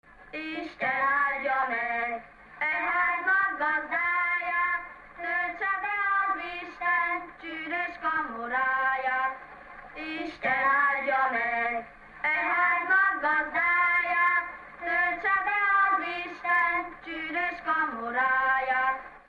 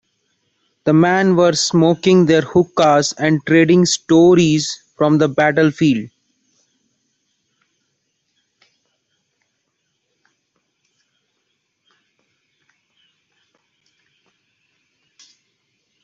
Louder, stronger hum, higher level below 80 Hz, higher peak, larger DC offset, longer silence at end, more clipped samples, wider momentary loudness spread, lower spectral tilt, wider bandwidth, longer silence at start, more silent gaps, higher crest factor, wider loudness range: second, -26 LUFS vs -14 LUFS; neither; about the same, -60 dBFS vs -58 dBFS; second, -14 dBFS vs -2 dBFS; neither; second, 0.1 s vs 9.95 s; neither; first, 13 LU vs 7 LU; about the same, -4.5 dB/octave vs -5.5 dB/octave; second, 7.2 kHz vs 8.2 kHz; second, 0.2 s vs 0.85 s; neither; about the same, 14 dB vs 16 dB; second, 4 LU vs 8 LU